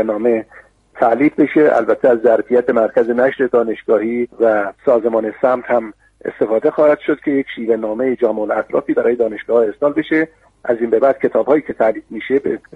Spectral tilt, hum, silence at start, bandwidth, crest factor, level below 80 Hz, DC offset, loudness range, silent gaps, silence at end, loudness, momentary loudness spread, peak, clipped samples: -8 dB/octave; none; 0 s; 4.5 kHz; 14 dB; -56 dBFS; under 0.1%; 3 LU; none; 0.15 s; -16 LUFS; 6 LU; 0 dBFS; under 0.1%